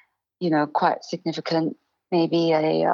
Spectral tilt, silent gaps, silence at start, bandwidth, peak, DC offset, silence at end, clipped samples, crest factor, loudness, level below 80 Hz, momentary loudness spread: -6.5 dB/octave; none; 0.4 s; 7.2 kHz; -6 dBFS; under 0.1%; 0 s; under 0.1%; 16 dB; -23 LUFS; -80 dBFS; 9 LU